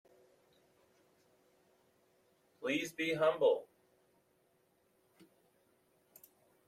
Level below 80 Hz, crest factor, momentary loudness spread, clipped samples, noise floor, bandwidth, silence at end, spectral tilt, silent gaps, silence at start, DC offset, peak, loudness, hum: -86 dBFS; 22 dB; 8 LU; under 0.1%; -75 dBFS; 16 kHz; 3.05 s; -4.5 dB/octave; none; 2.6 s; under 0.1%; -18 dBFS; -34 LUFS; none